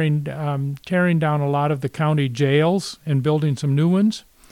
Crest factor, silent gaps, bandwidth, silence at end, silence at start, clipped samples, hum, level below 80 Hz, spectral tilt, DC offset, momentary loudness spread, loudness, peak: 14 dB; none; 12 kHz; 0.3 s; 0 s; under 0.1%; none; -58 dBFS; -7 dB/octave; under 0.1%; 7 LU; -20 LUFS; -6 dBFS